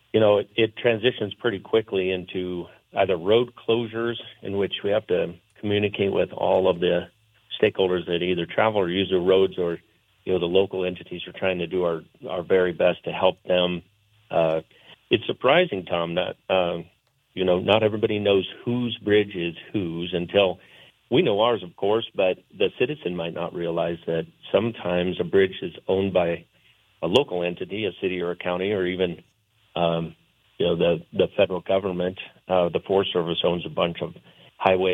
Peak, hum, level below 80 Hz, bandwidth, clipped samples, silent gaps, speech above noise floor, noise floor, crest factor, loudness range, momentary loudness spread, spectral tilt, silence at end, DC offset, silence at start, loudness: -4 dBFS; none; -64 dBFS; 7.4 kHz; under 0.1%; none; 37 dB; -60 dBFS; 20 dB; 3 LU; 9 LU; -7.5 dB/octave; 0 s; under 0.1%; 0.15 s; -24 LUFS